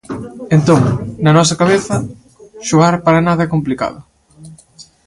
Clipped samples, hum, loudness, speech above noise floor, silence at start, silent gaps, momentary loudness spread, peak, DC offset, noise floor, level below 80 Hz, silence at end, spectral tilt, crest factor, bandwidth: under 0.1%; none; -13 LUFS; 30 dB; 0.1 s; none; 13 LU; 0 dBFS; under 0.1%; -43 dBFS; -44 dBFS; 0.25 s; -6 dB/octave; 14 dB; 11.5 kHz